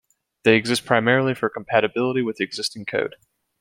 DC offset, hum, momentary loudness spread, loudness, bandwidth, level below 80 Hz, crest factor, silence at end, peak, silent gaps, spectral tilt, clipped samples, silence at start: under 0.1%; none; 8 LU; -21 LUFS; 16 kHz; -64 dBFS; 20 dB; 0.55 s; -2 dBFS; none; -5 dB/octave; under 0.1%; 0.45 s